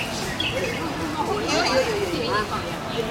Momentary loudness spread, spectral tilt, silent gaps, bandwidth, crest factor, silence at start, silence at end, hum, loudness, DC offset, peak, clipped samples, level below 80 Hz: 7 LU; -4 dB/octave; none; 16.5 kHz; 18 dB; 0 s; 0 s; none; -24 LUFS; under 0.1%; -6 dBFS; under 0.1%; -44 dBFS